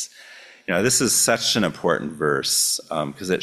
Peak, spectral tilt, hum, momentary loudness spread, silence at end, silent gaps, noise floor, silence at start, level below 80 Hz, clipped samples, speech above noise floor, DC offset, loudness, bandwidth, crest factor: -4 dBFS; -2.5 dB/octave; none; 10 LU; 0 s; none; -45 dBFS; 0 s; -56 dBFS; under 0.1%; 24 dB; under 0.1%; -20 LUFS; 16 kHz; 18 dB